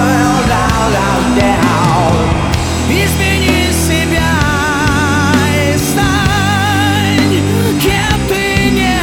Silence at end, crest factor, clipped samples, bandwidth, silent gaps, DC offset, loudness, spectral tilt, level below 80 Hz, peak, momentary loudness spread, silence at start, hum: 0 s; 10 dB; under 0.1%; 19.5 kHz; none; under 0.1%; -11 LUFS; -5 dB/octave; -24 dBFS; 0 dBFS; 2 LU; 0 s; none